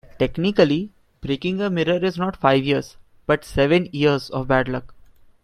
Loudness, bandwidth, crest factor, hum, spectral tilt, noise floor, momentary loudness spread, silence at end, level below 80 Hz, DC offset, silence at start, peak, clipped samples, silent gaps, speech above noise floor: -21 LUFS; 14 kHz; 20 dB; none; -7 dB/octave; -48 dBFS; 11 LU; 0.5 s; -44 dBFS; under 0.1%; 0.15 s; -2 dBFS; under 0.1%; none; 29 dB